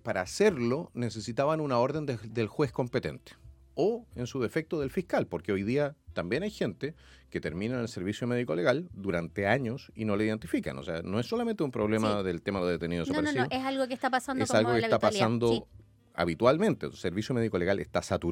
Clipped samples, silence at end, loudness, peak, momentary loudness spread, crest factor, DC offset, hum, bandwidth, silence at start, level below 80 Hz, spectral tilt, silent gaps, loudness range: under 0.1%; 0 s; -30 LUFS; -10 dBFS; 9 LU; 20 dB; under 0.1%; none; 16.5 kHz; 0.05 s; -58 dBFS; -6 dB/octave; none; 5 LU